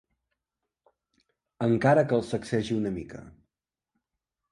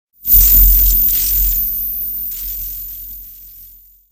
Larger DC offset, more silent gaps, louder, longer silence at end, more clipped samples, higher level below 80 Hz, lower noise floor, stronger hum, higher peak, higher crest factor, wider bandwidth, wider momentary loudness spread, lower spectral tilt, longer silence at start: neither; neither; second, -26 LUFS vs -11 LUFS; first, 1.2 s vs 0.45 s; neither; second, -60 dBFS vs -20 dBFS; first, -87 dBFS vs -42 dBFS; neither; second, -8 dBFS vs 0 dBFS; first, 22 dB vs 14 dB; second, 11.5 kHz vs over 20 kHz; about the same, 17 LU vs 19 LU; first, -7 dB/octave vs -2.5 dB/octave; first, 1.6 s vs 0.25 s